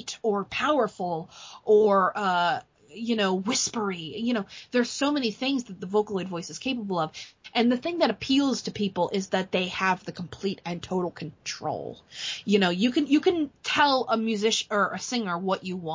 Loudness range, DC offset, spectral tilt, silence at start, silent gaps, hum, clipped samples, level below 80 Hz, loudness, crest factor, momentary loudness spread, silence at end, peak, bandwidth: 4 LU; under 0.1%; -4 dB/octave; 0 s; none; none; under 0.1%; -64 dBFS; -26 LUFS; 18 dB; 11 LU; 0 s; -10 dBFS; 7.6 kHz